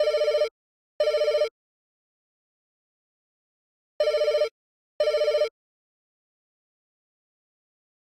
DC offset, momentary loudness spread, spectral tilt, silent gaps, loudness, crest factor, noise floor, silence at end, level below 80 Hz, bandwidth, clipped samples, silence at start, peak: under 0.1%; 7 LU; 0 dB/octave; 0.51-0.99 s, 1.51-3.99 s, 4.51-5.00 s; -25 LUFS; 16 dB; under -90 dBFS; 2.5 s; -66 dBFS; 12.5 kHz; under 0.1%; 0 s; -12 dBFS